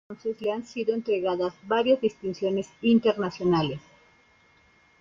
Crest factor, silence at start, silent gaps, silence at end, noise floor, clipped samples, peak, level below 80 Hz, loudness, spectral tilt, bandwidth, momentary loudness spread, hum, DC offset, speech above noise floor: 16 dB; 0.1 s; none; 1.2 s; -60 dBFS; under 0.1%; -10 dBFS; -62 dBFS; -26 LUFS; -7 dB/octave; 7.4 kHz; 8 LU; none; under 0.1%; 35 dB